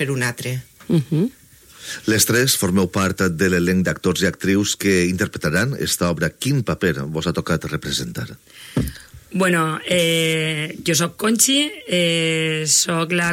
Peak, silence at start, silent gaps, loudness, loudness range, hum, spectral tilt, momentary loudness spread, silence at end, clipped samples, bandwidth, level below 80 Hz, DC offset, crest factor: -2 dBFS; 0 s; none; -19 LUFS; 5 LU; none; -3.5 dB/octave; 10 LU; 0 s; under 0.1%; 16.5 kHz; -46 dBFS; under 0.1%; 18 dB